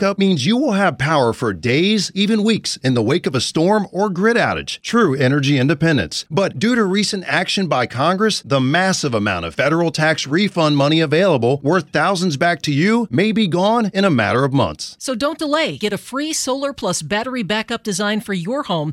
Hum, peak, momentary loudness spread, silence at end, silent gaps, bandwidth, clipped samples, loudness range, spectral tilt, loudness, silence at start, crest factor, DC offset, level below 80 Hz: none; 0 dBFS; 6 LU; 0 s; none; 15 kHz; under 0.1%; 4 LU; -5 dB/octave; -17 LUFS; 0 s; 16 dB; under 0.1%; -54 dBFS